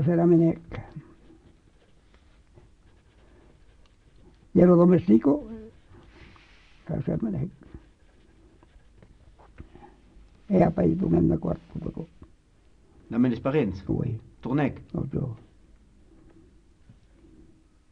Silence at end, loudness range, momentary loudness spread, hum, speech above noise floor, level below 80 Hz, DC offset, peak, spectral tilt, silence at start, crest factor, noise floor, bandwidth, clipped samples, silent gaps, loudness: 2.55 s; 12 LU; 22 LU; none; 35 dB; -50 dBFS; under 0.1%; -6 dBFS; -10.5 dB/octave; 0 s; 22 dB; -58 dBFS; 5.6 kHz; under 0.1%; none; -24 LUFS